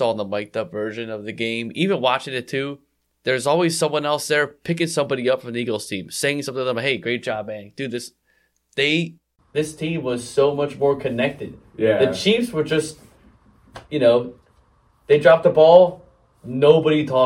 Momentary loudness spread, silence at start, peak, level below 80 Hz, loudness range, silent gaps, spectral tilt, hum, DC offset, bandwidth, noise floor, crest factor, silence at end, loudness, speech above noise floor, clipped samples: 15 LU; 0 s; 0 dBFS; -58 dBFS; 7 LU; none; -5 dB/octave; none; under 0.1%; 15 kHz; -65 dBFS; 20 dB; 0 s; -20 LUFS; 45 dB; under 0.1%